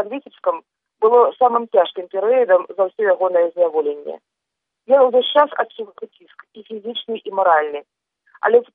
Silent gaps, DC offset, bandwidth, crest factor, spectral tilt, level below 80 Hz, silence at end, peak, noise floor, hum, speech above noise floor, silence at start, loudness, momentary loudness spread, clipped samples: none; under 0.1%; 3.9 kHz; 16 dB; -6.5 dB/octave; -78 dBFS; 0.1 s; -2 dBFS; -81 dBFS; none; 64 dB; 0 s; -17 LUFS; 18 LU; under 0.1%